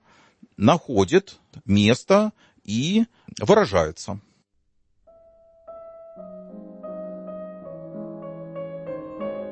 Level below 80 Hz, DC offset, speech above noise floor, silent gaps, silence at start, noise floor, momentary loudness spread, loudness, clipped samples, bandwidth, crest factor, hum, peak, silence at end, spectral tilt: -54 dBFS; under 0.1%; 46 dB; none; 0.6 s; -67 dBFS; 23 LU; -22 LUFS; under 0.1%; 8.8 kHz; 22 dB; none; -4 dBFS; 0 s; -6 dB/octave